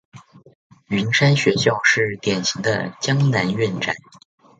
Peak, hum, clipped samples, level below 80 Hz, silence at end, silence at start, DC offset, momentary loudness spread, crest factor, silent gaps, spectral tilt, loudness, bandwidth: -2 dBFS; none; under 0.1%; -58 dBFS; 0.6 s; 0.15 s; under 0.1%; 8 LU; 20 dB; 0.55-0.70 s; -4.5 dB/octave; -19 LUFS; 9 kHz